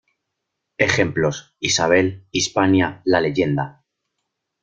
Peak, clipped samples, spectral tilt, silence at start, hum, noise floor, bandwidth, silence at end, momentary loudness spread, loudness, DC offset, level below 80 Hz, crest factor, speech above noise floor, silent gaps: -2 dBFS; under 0.1%; -4 dB/octave; 0.8 s; none; -79 dBFS; 9 kHz; 0.95 s; 7 LU; -19 LUFS; under 0.1%; -54 dBFS; 20 dB; 60 dB; none